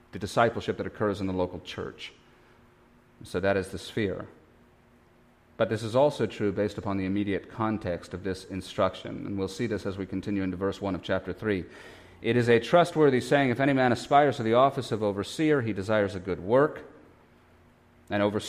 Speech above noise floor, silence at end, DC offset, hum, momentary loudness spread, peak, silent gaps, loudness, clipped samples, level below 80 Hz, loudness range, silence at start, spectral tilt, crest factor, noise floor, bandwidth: 33 dB; 0 s; under 0.1%; none; 13 LU; -8 dBFS; none; -27 LUFS; under 0.1%; -58 dBFS; 9 LU; 0.15 s; -6.5 dB/octave; 20 dB; -60 dBFS; 15 kHz